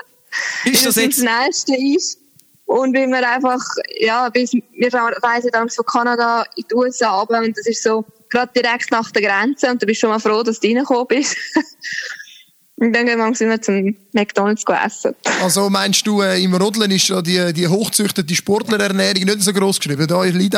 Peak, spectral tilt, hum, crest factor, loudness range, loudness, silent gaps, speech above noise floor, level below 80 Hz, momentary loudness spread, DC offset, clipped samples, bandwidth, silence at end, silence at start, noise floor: -2 dBFS; -3.5 dB/octave; none; 16 dB; 3 LU; -16 LUFS; none; 30 dB; -64 dBFS; 6 LU; under 0.1%; under 0.1%; over 20 kHz; 0 s; 0.3 s; -46 dBFS